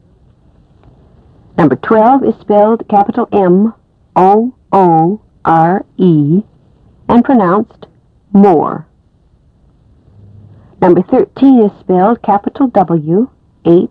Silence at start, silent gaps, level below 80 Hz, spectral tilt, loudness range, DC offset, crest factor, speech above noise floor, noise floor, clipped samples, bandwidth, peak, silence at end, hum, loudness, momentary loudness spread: 1.55 s; none; -46 dBFS; -10.5 dB/octave; 3 LU; under 0.1%; 12 dB; 40 dB; -49 dBFS; 0.6%; 5 kHz; 0 dBFS; 0.05 s; none; -10 LUFS; 7 LU